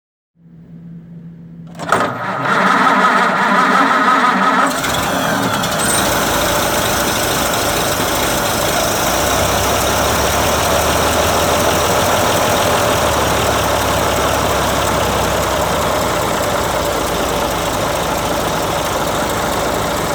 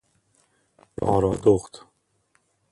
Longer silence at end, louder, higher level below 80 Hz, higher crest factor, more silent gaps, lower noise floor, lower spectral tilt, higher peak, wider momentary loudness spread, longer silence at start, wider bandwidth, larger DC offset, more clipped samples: second, 0 s vs 0.95 s; first, -14 LUFS vs -22 LUFS; first, -32 dBFS vs -48 dBFS; second, 14 dB vs 20 dB; neither; second, -38 dBFS vs -68 dBFS; second, -3 dB/octave vs -7.5 dB/octave; first, 0 dBFS vs -6 dBFS; second, 6 LU vs 22 LU; second, 0.5 s vs 1 s; first, over 20 kHz vs 11.5 kHz; neither; neither